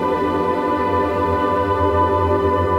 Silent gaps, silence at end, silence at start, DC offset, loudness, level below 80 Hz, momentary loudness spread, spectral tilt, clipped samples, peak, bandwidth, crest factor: none; 0 s; 0 s; under 0.1%; -18 LUFS; -36 dBFS; 2 LU; -8 dB/octave; under 0.1%; -6 dBFS; 13.5 kHz; 12 dB